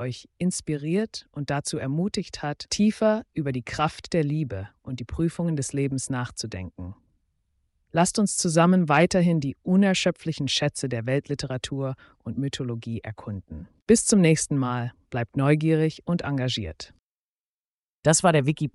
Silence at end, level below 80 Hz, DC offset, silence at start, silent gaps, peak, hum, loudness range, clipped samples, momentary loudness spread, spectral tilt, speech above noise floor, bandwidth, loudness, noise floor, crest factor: 0.05 s; -52 dBFS; under 0.1%; 0 s; 13.82-13.86 s, 16.99-18.03 s; -6 dBFS; none; 6 LU; under 0.1%; 16 LU; -5 dB/octave; over 65 dB; 11.5 kHz; -25 LUFS; under -90 dBFS; 20 dB